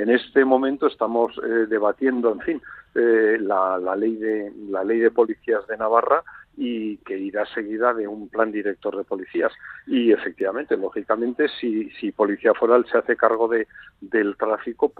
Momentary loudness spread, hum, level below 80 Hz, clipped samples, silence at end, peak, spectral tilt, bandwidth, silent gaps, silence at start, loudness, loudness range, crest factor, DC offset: 10 LU; none; -64 dBFS; under 0.1%; 0.1 s; -2 dBFS; -8 dB/octave; 4.6 kHz; none; 0 s; -22 LUFS; 3 LU; 20 dB; under 0.1%